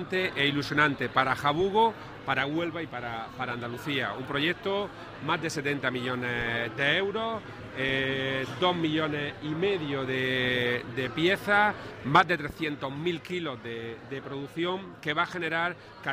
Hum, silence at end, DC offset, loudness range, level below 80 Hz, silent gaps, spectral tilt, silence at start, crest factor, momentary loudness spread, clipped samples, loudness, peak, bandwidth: none; 0 s; under 0.1%; 5 LU; -58 dBFS; none; -5 dB/octave; 0 s; 22 dB; 11 LU; under 0.1%; -28 LUFS; -8 dBFS; 16 kHz